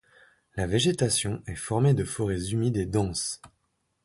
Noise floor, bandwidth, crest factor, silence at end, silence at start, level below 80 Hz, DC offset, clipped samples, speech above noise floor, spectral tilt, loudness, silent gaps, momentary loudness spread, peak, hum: -75 dBFS; 11.5 kHz; 18 dB; 0.6 s; 0.55 s; -48 dBFS; under 0.1%; under 0.1%; 48 dB; -5 dB/octave; -27 LUFS; none; 10 LU; -10 dBFS; none